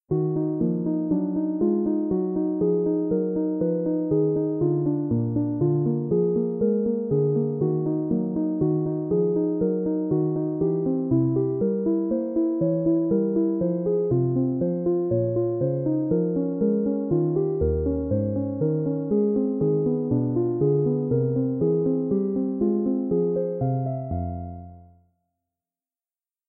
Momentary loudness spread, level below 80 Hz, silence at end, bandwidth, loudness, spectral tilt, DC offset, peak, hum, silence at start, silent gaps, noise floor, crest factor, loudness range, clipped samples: 3 LU; -46 dBFS; 1.65 s; 2.1 kHz; -24 LUFS; -16.5 dB/octave; under 0.1%; -10 dBFS; none; 0.1 s; none; under -90 dBFS; 12 dB; 1 LU; under 0.1%